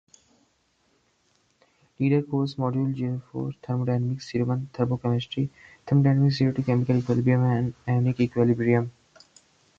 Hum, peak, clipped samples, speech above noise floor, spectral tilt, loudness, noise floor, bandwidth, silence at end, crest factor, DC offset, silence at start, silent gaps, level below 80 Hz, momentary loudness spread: none; -8 dBFS; under 0.1%; 44 dB; -8.5 dB/octave; -25 LUFS; -68 dBFS; 7.4 kHz; 0.9 s; 18 dB; under 0.1%; 2 s; none; -58 dBFS; 9 LU